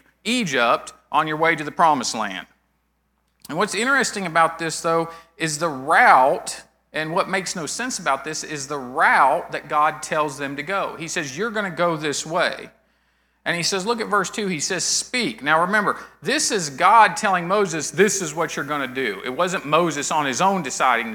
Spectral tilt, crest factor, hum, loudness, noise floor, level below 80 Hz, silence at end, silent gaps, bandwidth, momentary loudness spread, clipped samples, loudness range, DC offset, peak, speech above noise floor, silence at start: -3 dB/octave; 22 dB; none; -20 LUFS; -68 dBFS; -62 dBFS; 0 s; none; over 20 kHz; 11 LU; under 0.1%; 5 LU; under 0.1%; 0 dBFS; 47 dB; 0.25 s